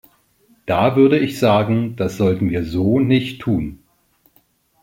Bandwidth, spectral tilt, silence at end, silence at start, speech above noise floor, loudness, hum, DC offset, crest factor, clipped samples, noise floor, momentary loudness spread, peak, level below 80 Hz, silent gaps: 16.5 kHz; -7.5 dB/octave; 1.05 s; 0.65 s; 43 dB; -17 LUFS; none; under 0.1%; 16 dB; under 0.1%; -59 dBFS; 9 LU; -2 dBFS; -46 dBFS; none